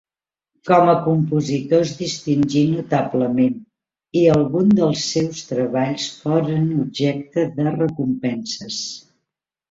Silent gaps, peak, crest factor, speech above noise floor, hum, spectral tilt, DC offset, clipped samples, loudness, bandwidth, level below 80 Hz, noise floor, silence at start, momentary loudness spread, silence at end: none; 0 dBFS; 18 dB; 70 dB; none; -6 dB/octave; under 0.1%; under 0.1%; -19 LUFS; 7.8 kHz; -56 dBFS; -89 dBFS; 0.65 s; 10 LU; 0.7 s